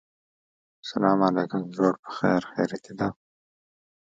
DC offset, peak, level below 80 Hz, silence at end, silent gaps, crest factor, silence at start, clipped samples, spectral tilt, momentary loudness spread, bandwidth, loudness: under 0.1%; -6 dBFS; -64 dBFS; 1.05 s; 1.99-2.03 s; 22 dB; 0.85 s; under 0.1%; -7 dB/octave; 9 LU; 7.8 kHz; -26 LUFS